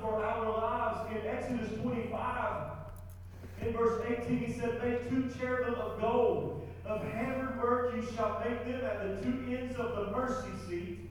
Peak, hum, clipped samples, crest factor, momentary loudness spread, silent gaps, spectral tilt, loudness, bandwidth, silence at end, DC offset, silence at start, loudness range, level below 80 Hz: -18 dBFS; none; under 0.1%; 16 dB; 9 LU; none; -7 dB/octave; -35 LUFS; 18.5 kHz; 0 s; under 0.1%; 0 s; 3 LU; -54 dBFS